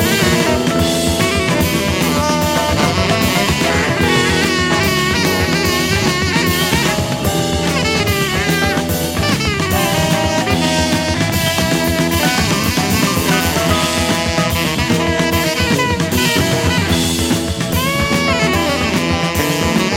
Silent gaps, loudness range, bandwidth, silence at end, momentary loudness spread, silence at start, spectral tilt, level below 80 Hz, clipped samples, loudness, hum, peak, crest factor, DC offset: none; 1 LU; 16.5 kHz; 0 s; 2 LU; 0 s; -4 dB/octave; -30 dBFS; under 0.1%; -14 LUFS; none; 0 dBFS; 14 dB; under 0.1%